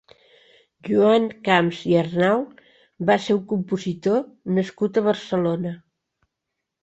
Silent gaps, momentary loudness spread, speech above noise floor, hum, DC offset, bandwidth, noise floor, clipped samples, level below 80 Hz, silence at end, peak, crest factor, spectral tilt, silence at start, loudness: none; 8 LU; 61 dB; none; under 0.1%; 8.2 kHz; -82 dBFS; under 0.1%; -64 dBFS; 1.05 s; -2 dBFS; 20 dB; -7 dB/octave; 0.85 s; -22 LUFS